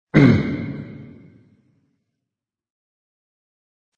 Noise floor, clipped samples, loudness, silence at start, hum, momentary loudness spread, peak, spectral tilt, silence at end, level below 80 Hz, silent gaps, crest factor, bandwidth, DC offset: -85 dBFS; under 0.1%; -18 LUFS; 0.15 s; none; 24 LU; -2 dBFS; -8.5 dB/octave; 2.95 s; -48 dBFS; none; 22 dB; 7.2 kHz; under 0.1%